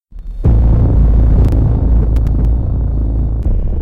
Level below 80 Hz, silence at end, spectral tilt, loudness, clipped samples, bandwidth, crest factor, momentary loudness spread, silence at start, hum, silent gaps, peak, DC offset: -12 dBFS; 0 s; -11 dB/octave; -14 LUFS; under 0.1%; 2.1 kHz; 8 dB; 6 LU; 0 s; none; none; -2 dBFS; 2%